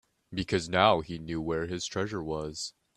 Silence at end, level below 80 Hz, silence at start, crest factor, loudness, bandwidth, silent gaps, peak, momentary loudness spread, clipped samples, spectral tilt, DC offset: 0.25 s; -56 dBFS; 0.3 s; 24 dB; -30 LUFS; 12.5 kHz; none; -6 dBFS; 13 LU; under 0.1%; -4.5 dB/octave; under 0.1%